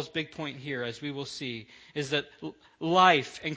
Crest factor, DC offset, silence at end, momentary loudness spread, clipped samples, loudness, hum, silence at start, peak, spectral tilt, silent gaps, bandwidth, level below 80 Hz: 24 dB; under 0.1%; 0 s; 20 LU; under 0.1%; -28 LUFS; none; 0 s; -6 dBFS; -4.5 dB/octave; none; 8 kHz; -68 dBFS